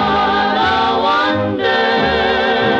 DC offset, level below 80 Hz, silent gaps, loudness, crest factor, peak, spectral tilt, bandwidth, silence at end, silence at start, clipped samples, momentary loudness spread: under 0.1%; -40 dBFS; none; -14 LUFS; 14 dB; 0 dBFS; -5.5 dB/octave; 8.2 kHz; 0 s; 0 s; under 0.1%; 1 LU